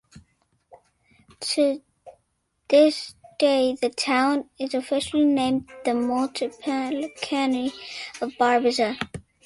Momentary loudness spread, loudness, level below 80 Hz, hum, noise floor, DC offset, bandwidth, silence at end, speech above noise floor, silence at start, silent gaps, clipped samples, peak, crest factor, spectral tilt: 12 LU; -24 LUFS; -62 dBFS; none; -72 dBFS; under 0.1%; 11.5 kHz; 0.25 s; 49 dB; 0.15 s; none; under 0.1%; -6 dBFS; 20 dB; -3.5 dB/octave